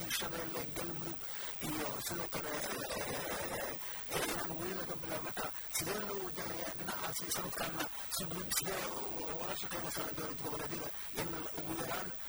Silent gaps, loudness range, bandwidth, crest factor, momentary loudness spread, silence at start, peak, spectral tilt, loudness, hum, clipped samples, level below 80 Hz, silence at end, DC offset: none; 1 LU; over 20 kHz; 22 dB; 3 LU; 0 s; -18 dBFS; -2.5 dB/octave; -38 LUFS; none; under 0.1%; -60 dBFS; 0 s; under 0.1%